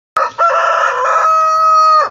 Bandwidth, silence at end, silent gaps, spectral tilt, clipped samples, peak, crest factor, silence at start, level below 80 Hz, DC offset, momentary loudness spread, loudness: 12 kHz; 0 s; none; -0.5 dB/octave; under 0.1%; -2 dBFS; 10 dB; 0.15 s; -62 dBFS; under 0.1%; 4 LU; -11 LUFS